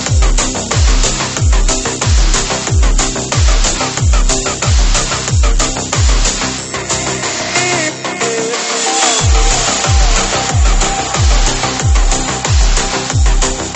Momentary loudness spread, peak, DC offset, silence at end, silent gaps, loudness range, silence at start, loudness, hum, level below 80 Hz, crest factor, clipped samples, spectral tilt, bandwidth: 4 LU; 0 dBFS; under 0.1%; 0 s; none; 2 LU; 0 s; -13 LUFS; none; -14 dBFS; 12 dB; under 0.1%; -3 dB/octave; 8.8 kHz